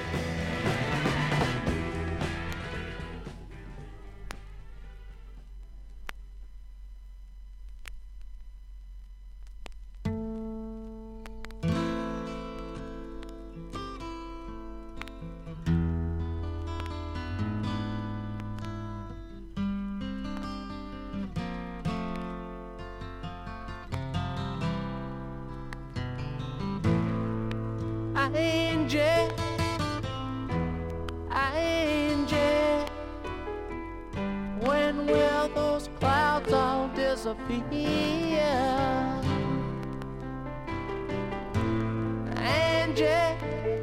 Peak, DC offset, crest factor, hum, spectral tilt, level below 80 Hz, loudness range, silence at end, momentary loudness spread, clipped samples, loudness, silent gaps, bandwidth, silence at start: -12 dBFS; under 0.1%; 20 dB; none; -6 dB/octave; -44 dBFS; 18 LU; 0 s; 23 LU; under 0.1%; -30 LUFS; none; 16 kHz; 0 s